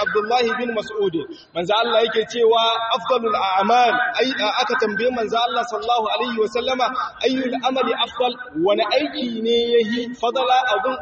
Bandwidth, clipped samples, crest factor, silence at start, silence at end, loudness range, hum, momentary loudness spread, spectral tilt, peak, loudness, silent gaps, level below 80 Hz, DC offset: 8 kHz; under 0.1%; 14 dB; 0 s; 0 s; 3 LU; none; 6 LU; -0.5 dB/octave; -6 dBFS; -20 LUFS; none; -60 dBFS; under 0.1%